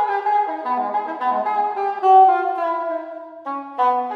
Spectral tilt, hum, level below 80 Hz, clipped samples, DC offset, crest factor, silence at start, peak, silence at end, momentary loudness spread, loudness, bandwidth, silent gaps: -5 dB/octave; none; -90 dBFS; under 0.1%; under 0.1%; 16 dB; 0 s; -4 dBFS; 0 s; 17 LU; -19 LUFS; 5 kHz; none